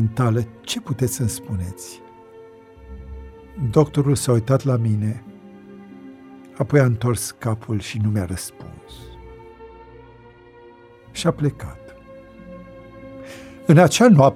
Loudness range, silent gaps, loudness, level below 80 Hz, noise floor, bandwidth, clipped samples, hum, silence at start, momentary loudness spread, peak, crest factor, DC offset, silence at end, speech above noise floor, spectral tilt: 8 LU; none; -20 LUFS; -46 dBFS; -46 dBFS; 15.5 kHz; under 0.1%; none; 0 s; 25 LU; -2 dBFS; 20 dB; under 0.1%; 0 s; 28 dB; -6 dB/octave